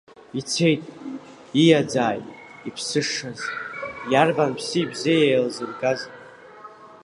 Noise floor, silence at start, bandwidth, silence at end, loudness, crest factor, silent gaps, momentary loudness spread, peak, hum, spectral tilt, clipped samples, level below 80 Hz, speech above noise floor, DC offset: -44 dBFS; 0.35 s; 11.5 kHz; 0.1 s; -22 LUFS; 20 dB; none; 19 LU; -2 dBFS; none; -4.5 dB/octave; under 0.1%; -66 dBFS; 23 dB; under 0.1%